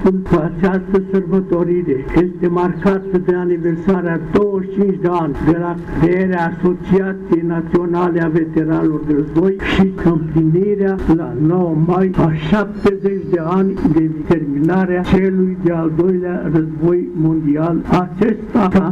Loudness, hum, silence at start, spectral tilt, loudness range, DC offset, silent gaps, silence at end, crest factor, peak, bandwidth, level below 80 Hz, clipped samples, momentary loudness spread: -16 LUFS; none; 0 s; -9.5 dB/octave; 1 LU; under 0.1%; none; 0 s; 12 dB; -4 dBFS; 7 kHz; -34 dBFS; under 0.1%; 3 LU